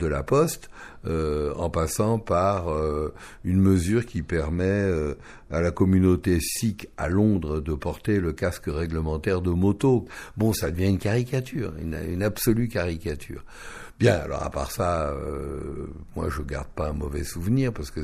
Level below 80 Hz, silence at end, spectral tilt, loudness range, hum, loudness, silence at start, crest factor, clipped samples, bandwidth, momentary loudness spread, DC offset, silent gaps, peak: -40 dBFS; 0 s; -6.5 dB/octave; 4 LU; none; -25 LUFS; 0 s; 20 dB; under 0.1%; 14.5 kHz; 12 LU; under 0.1%; none; -6 dBFS